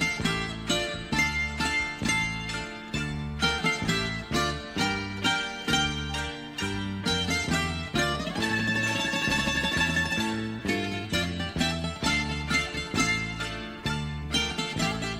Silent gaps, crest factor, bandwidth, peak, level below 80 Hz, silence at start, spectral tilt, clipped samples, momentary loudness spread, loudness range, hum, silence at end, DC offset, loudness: none; 18 dB; 16 kHz; -10 dBFS; -42 dBFS; 0 s; -3.5 dB/octave; under 0.1%; 7 LU; 2 LU; none; 0 s; under 0.1%; -27 LUFS